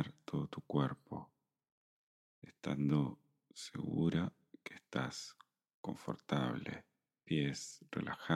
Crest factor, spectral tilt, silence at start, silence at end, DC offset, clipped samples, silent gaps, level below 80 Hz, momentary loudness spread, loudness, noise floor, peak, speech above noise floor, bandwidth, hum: 22 dB; -6 dB/octave; 0 s; 0 s; under 0.1%; under 0.1%; 1.72-2.42 s, 5.74-5.84 s; -70 dBFS; 17 LU; -40 LUFS; -61 dBFS; -18 dBFS; 23 dB; 13 kHz; none